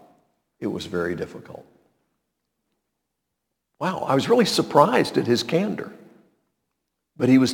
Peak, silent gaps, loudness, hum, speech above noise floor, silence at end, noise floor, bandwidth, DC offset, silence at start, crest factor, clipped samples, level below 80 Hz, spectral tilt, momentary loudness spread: -2 dBFS; none; -22 LUFS; none; 59 dB; 0 s; -80 dBFS; 18 kHz; under 0.1%; 0.6 s; 22 dB; under 0.1%; -64 dBFS; -5.5 dB/octave; 15 LU